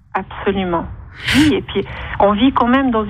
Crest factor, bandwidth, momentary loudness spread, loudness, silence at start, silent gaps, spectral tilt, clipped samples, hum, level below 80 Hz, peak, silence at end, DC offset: 14 dB; 15.5 kHz; 11 LU; -16 LUFS; 0.15 s; none; -5.5 dB/octave; under 0.1%; none; -36 dBFS; -2 dBFS; 0 s; under 0.1%